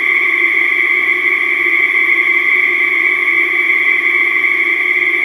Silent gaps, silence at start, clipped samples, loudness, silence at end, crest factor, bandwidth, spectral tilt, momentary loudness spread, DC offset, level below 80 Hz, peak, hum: none; 0 s; under 0.1%; -10 LUFS; 0 s; 12 dB; 14 kHz; -2 dB/octave; 1 LU; under 0.1%; -66 dBFS; 0 dBFS; none